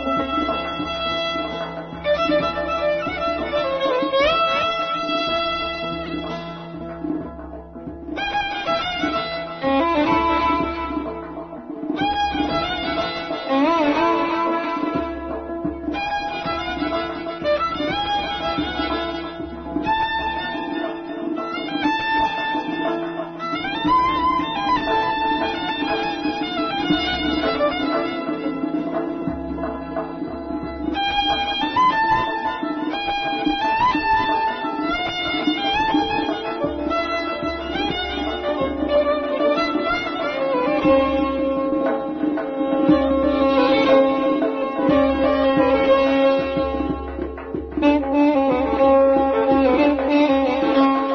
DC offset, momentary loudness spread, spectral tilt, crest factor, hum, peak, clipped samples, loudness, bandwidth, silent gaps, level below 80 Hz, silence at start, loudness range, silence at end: under 0.1%; 11 LU; -6 dB/octave; 16 dB; none; -6 dBFS; under 0.1%; -21 LUFS; 6.4 kHz; none; -42 dBFS; 0 s; 6 LU; 0 s